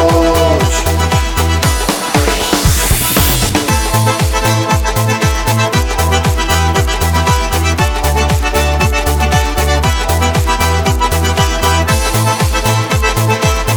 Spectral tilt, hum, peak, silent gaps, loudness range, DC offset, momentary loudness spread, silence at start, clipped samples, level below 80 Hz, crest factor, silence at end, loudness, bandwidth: -4 dB/octave; none; 0 dBFS; none; 1 LU; under 0.1%; 2 LU; 0 s; under 0.1%; -18 dBFS; 12 dB; 0 s; -12 LUFS; over 20 kHz